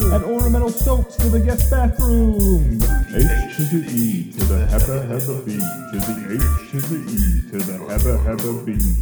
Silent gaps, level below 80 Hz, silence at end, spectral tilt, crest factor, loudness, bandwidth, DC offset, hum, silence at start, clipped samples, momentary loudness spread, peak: none; -20 dBFS; 0 s; -6.5 dB/octave; 14 dB; -19 LUFS; over 20 kHz; under 0.1%; none; 0 s; under 0.1%; 6 LU; -2 dBFS